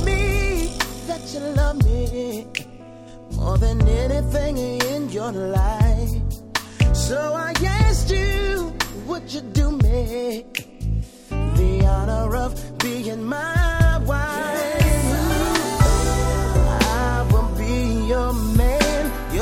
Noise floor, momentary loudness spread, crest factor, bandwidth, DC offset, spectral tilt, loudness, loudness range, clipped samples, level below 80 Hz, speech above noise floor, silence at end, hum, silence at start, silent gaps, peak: -40 dBFS; 10 LU; 18 dB; 16.5 kHz; under 0.1%; -5.5 dB/octave; -21 LUFS; 4 LU; under 0.1%; -22 dBFS; 20 dB; 0 s; none; 0 s; none; -2 dBFS